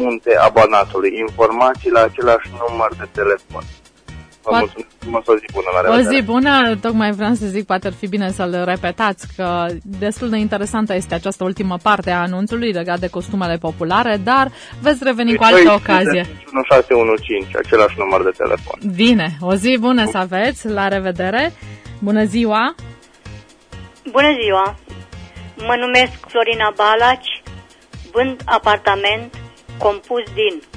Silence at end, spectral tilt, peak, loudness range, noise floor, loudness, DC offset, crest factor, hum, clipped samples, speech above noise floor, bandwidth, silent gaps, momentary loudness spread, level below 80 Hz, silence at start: 0 s; -5 dB/octave; 0 dBFS; 6 LU; -38 dBFS; -16 LUFS; under 0.1%; 16 dB; none; under 0.1%; 22 dB; 10.5 kHz; none; 10 LU; -42 dBFS; 0 s